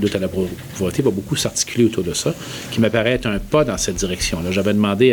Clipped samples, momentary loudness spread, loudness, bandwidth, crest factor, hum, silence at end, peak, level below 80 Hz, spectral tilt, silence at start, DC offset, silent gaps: under 0.1%; 7 LU; -19 LUFS; over 20 kHz; 16 dB; none; 0 s; -2 dBFS; -38 dBFS; -4.5 dB/octave; 0 s; under 0.1%; none